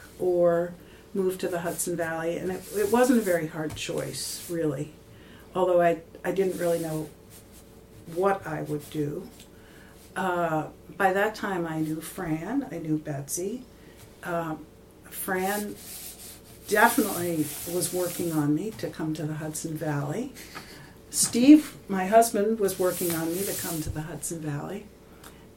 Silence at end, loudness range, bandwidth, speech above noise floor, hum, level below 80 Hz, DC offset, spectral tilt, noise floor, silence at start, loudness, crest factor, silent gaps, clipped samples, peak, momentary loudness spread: 0.05 s; 9 LU; 17 kHz; 23 dB; none; -56 dBFS; under 0.1%; -4.5 dB/octave; -50 dBFS; 0 s; -27 LUFS; 22 dB; none; under 0.1%; -4 dBFS; 17 LU